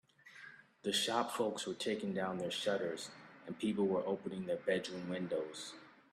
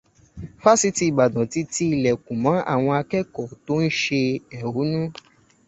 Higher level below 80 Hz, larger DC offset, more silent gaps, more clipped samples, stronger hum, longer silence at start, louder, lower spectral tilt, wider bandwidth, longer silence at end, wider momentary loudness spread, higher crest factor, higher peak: second, -80 dBFS vs -54 dBFS; neither; neither; neither; neither; about the same, 0.25 s vs 0.35 s; second, -38 LUFS vs -22 LUFS; about the same, -4 dB/octave vs -5 dB/octave; first, 15 kHz vs 8.4 kHz; second, 0.2 s vs 0.55 s; first, 19 LU vs 11 LU; about the same, 20 dB vs 20 dB; second, -18 dBFS vs -2 dBFS